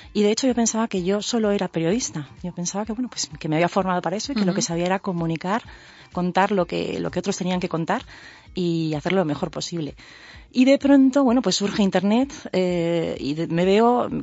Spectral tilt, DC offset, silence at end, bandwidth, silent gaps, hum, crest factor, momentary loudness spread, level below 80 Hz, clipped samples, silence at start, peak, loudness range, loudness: -5 dB/octave; under 0.1%; 0 s; 8 kHz; none; none; 18 dB; 10 LU; -52 dBFS; under 0.1%; 0 s; -4 dBFS; 5 LU; -22 LUFS